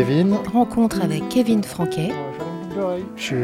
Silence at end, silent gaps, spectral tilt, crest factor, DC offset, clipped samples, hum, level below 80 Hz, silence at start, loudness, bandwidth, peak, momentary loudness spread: 0 s; none; -6.5 dB/octave; 16 dB; under 0.1%; under 0.1%; none; -50 dBFS; 0 s; -21 LUFS; 15 kHz; -4 dBFS; 10 LU